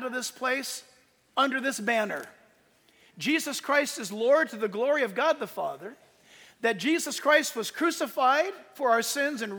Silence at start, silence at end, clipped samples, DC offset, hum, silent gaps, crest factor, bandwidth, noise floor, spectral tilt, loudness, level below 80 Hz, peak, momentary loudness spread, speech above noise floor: 0 s; 0 s; under 0.1%; under 0.1%; none; none; 20 dB; over 20 kHz; -63 dBFS; -2.5 dB/octave; -27 LUFS; -82 dBFS; -8 dBFS; 10 LU; 36 dB